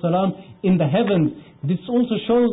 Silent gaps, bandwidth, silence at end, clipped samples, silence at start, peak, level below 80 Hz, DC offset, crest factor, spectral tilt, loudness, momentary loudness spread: none; 4 kHz; 0 s; under 0.1%; 0.05 s; -10 dBFS; -56 dBFS; under 0.1%; 10 dB; -12.5 dB/octave; -21 LUFS; 7 LU